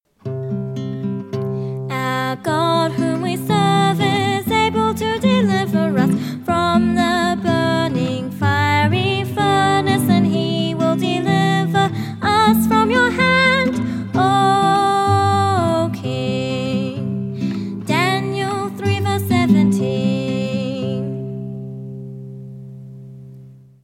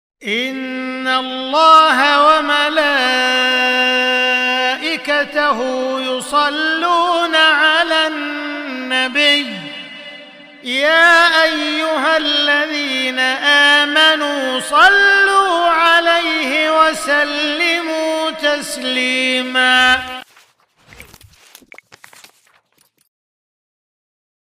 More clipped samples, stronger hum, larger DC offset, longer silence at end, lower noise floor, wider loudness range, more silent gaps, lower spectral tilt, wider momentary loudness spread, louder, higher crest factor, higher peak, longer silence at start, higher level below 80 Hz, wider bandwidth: neither; neither; neither; second, 0.3 s vs 3.5 s; second, -41 dBFS vs -59 dBFS; about the same, 6 LU vs 5 LU; neither; first, -6 dB/octave vs -1 dB/octave; about the same, 11 LU vs 12 LU; second, -18 LUFS vs -13 LUFS; about the same, 16 dB vs 16 dB; about the same, -2 dBFS vs 0 dBFS; about the same, 0.25 s vs 0.2 s; first, -50 dBFS vs -56 dBFS; about the same, 16.5 kHz vs 16 kHz